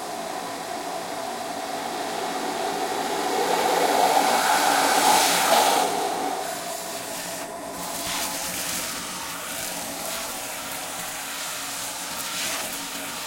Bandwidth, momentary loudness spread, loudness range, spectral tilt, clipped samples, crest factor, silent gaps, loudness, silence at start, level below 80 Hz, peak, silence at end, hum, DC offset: 16.5 kHz; 12 LU; 9 LU; -1 dB/octave; under 0.1%; 20 dB; none; -25 LUFS; 0 s; -62 dBFS; -6 dBFS; 0 s; none; under 0.1%